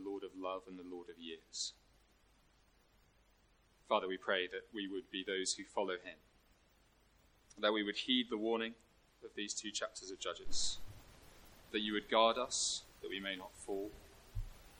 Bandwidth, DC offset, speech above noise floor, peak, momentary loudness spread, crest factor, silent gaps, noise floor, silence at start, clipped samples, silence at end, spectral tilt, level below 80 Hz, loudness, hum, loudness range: 16.5 kHz; under 0.1%; 32 dB; -18 dBFS; 16 LU; 24 dB; none; -71 dBFS; 0 s; under 0.1%; 0 s; -2 dB/octave; -60 dBFS; -39 LUFS; none; 7 LU